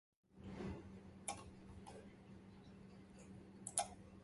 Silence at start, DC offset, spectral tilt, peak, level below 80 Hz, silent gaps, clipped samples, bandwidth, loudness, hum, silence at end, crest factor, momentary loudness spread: 0.3 s; under 0.1%; -3.5 dB/octave; -16 dBFS; -68 dBFS; none; under 0.1%; 11.5 kHz; -51 LUFS; none; 0 s; 36 dB; 17 LU